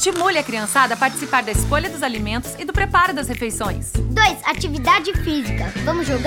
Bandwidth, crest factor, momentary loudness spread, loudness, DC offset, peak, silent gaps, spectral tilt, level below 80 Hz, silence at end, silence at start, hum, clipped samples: 18.5 kHz; 18 dB; 8 LU; -19 LUFS; under 0.1%; -2 dBFS; none; -4 dB/octave; -30 dBFS; 0 s; 0 s; none; under 0.1%